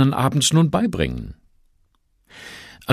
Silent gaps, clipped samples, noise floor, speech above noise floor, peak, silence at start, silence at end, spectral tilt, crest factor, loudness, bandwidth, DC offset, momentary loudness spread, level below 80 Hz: none; under 0.1%; -63 dBFS; 44 dB; -2 dBFS; 0 s; 0 s; -5 dB/octave; 20 dB; -19 LUFS; 14 kHz; under 0.1%; 22 LU; -42 dBFS